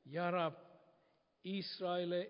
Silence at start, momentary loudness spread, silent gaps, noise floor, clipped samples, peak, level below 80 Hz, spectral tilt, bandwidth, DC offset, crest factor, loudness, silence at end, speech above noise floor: 0.05 s; 13 LU; none; -76 dBFS; under 0.1%; -24 dBFS; under -90 dBFS; -4 dB/octave; 5.2 kHz; under 0.1%; 18 dB; -40 LUFS; 0 s; 36 dB